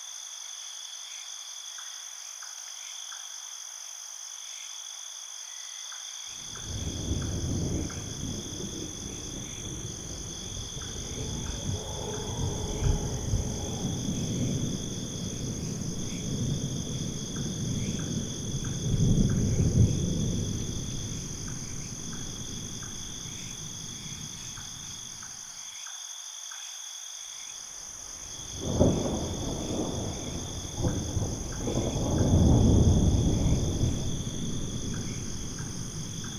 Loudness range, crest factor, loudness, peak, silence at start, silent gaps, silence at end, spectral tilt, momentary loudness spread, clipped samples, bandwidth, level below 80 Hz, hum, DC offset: 12 LU; 22 dB; -32 LUFS; -10 dBFS; 0 s; none; 0 s; -5 dB/octave; 12 LU; under 0.1%; 16 kHz; -40 dBFS; none; under 0.1%